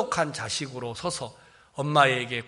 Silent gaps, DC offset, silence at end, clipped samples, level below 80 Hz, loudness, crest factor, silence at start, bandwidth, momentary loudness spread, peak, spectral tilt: none; under 0.1%; 0 s; under 0.1%; -62 dBFS; -26 LUFS; 24 dB; 0 s; 11.5 kHz; 14 LU; -4 dBFS; -3.5 dB/octave